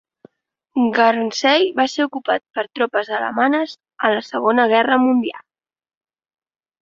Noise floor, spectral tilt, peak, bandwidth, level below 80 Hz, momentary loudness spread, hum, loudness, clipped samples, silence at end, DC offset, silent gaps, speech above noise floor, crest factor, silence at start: -59 dBFS; -3.5 dB/octave; -2 dBFS; 7.6 kHz; -66 dBFS; 7 LU; none; -18 LUFS; under 0.1%; 1.45 s; under 0.1%; none; 42 dB; 18 dB; 0.75 s